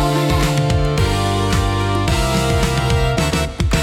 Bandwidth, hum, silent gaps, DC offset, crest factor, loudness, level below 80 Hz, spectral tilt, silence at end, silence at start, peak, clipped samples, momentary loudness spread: 16.5 kHz; none; none; under 0.1%; 12 dB; -17 LUFS; -24 dBFS; -5 dB/octave; 0 s; 0 s; -4 dBFS; under 0.1%; 2 LU